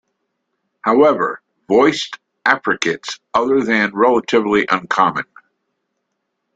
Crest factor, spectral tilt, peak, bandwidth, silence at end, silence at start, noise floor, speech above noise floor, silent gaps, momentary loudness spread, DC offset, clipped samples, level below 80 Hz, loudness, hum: 16 dB; -4.5 dB/octave; -2 dBFS; 9 kHz; 1.35 s; 0.85 s; -74 dBFS; 58 dB; none; 11 LU; under 0.1%; under 0.1%; -58 dBFS; -16 LUFS; none